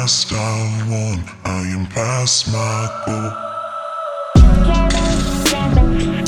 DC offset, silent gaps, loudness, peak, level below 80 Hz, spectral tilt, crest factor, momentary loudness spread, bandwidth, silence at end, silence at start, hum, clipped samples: under 0.1%; none; -17 LUFS; 0 dBFS; -20 dBFS; -4.5 dB/octave; 16 dB; 12 LU; 17 kHz; 0 s; 0 s; none; under 0.1%